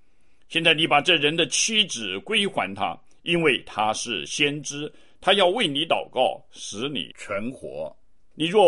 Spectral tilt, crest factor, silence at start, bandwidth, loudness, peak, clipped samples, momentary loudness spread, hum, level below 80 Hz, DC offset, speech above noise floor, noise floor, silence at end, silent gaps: -2.5 dB/octave; 20 dB; 0.5 s; 11.5 kHz; -22 LUFS; -4 dBFS; under 0.1%; 15 LU; none; -60 dBFS; 0.4%; 38 dB; -62 dBFS; 0 s; none